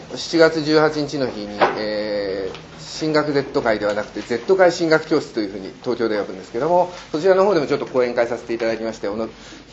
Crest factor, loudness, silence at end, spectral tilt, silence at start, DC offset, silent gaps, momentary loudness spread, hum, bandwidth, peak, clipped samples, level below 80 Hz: 20 dB; -20 LUFS; 0 s; -5 dB/octave; 0 s; under 0.1%; none; 12 LU; none; 8.2 kHz; 0 dBFS; under 0.1%; -52 dBFS